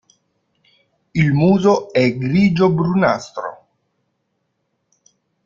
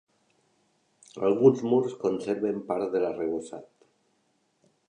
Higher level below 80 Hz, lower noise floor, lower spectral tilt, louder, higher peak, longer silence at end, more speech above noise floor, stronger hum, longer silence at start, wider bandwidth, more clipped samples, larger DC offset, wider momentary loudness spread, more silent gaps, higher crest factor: first, -52 dBFS vs -72 dBFS; about the same, -71 dBFS vs -72 dBFS; about the same, -7.5 dB/octave vs -7.5 dB/octave; first, -16 LUFS vs -27 LUFS; first, 0 dBFS vs -6 dBFS; first, 1.9 s vs 1.25 s; first, 55 dB vs 46 dB; neither; about the same, 1.15 s vs 1.15 s; second, 7.4 kHz vs 9.8 kHz; neither; neither; second, 13 LU vs 16 LU; neither; about the same, 18 dB vs 22 dB